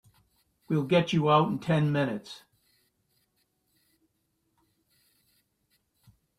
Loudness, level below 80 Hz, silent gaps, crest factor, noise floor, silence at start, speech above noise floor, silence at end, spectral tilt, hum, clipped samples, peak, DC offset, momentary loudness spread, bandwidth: -26 LUFS; -68 dBFS; none; 20 dB; -76 dBFS; 0.7 s; 51 dB; 4 s; -7 dB/octave; none; under 0.1%; -10 dBFS; under 0.1%; 16 LU; 11.5 kHz